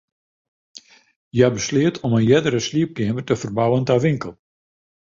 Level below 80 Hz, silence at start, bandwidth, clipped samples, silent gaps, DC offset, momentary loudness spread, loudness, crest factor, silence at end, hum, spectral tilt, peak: -52 dBFS; 0.75 s; 7.6 kHz; under 0.1%; 1.16-1.31 s; under 0.1%; 8 LU; -19 LUFS; 18 dB; 0.8 s; none; -6 dB/octave; -2 dBFS